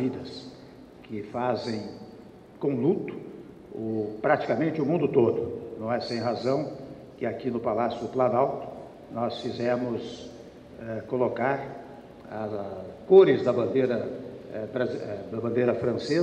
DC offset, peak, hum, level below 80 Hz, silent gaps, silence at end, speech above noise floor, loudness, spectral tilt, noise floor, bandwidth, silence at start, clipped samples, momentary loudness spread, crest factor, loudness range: under 0.1%; -6 dBFS; none; -62 dBFS; none; 0 s; 22 dB; -27 LUFS; -7.5 dB/octave; -48 dBFS; 8.6 kHz; 0 s; under 0.1%; 18 LU; 22 dB; 7 LU